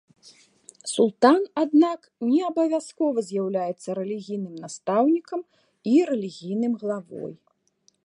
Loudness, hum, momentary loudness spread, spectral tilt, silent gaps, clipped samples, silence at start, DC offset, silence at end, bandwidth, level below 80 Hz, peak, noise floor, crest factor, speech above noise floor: -24 LUFS; none; 15 LU; -5.5 dB/octave; none; under 0.1%; 0.25 s; under 0.1%; 0.7 s; 11.5 kHz; -78 dBFS; -4 dBFS; -66 dBFS; 20 dB; 43 dB